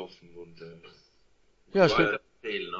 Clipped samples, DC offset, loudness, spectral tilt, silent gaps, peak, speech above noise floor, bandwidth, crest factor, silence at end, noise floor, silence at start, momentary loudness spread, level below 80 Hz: under 0.1%; under 0.1%; -26 LUFS; -6 dB/octave; none; -8 dBFS; 37 dB; 8 kHz; 22 dB; 0 s; -64 dBFS; 0 s; 26 LU; -60 dBFS